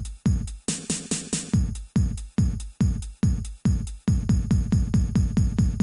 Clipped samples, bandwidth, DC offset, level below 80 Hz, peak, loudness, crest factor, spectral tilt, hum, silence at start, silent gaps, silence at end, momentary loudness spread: under 0.1%; 11.5 kHz; under 0.1%; -28 dBFS; -10 dBFS; -26 LUFS; 12 dB; -6 dB/octave; none; 0 s; none; 0 s; 4 LU